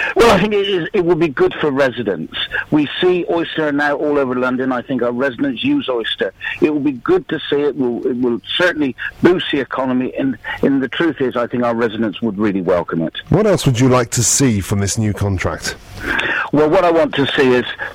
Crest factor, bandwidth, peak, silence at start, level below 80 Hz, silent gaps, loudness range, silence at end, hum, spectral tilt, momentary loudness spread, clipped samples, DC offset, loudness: 16 dB; 16 kHz; 0 dBFS; 0 s; -42 dBFS; none; 2 LU; 0 s; none; -4.5 dB/octave; 7 LU; under 0.1%; under 0.1%; -16 LUFS